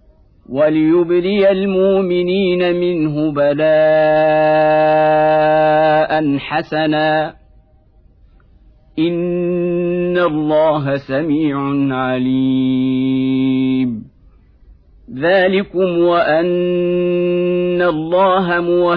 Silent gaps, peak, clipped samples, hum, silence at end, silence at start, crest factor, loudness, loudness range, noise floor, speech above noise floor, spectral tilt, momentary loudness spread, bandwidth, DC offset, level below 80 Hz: none; -4 dBFS; under 0.1%; none; 0 s; 0.5 s; 12 dB; -15 LUFS; 6 LU; -49 dBFS; 35 dB; -10 dB/octave; 6 LU; 5.4 kHz; under 0.1%; -48 dBFS